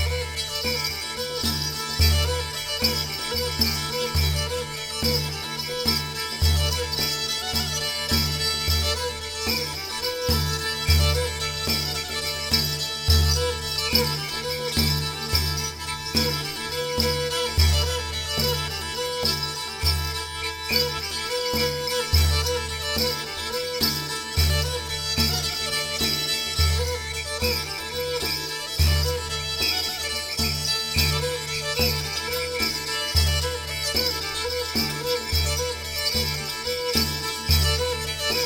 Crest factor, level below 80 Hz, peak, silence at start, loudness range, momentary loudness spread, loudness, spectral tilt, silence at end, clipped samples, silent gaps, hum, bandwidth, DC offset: 20 dB; -32 dBFS; -4 dBFS; 0 s; 2 LU; 6 LU; -23 LUFS; -3 dB/octave; 0 s; under 0.1%; none; none; 19 kHz; under 0.1%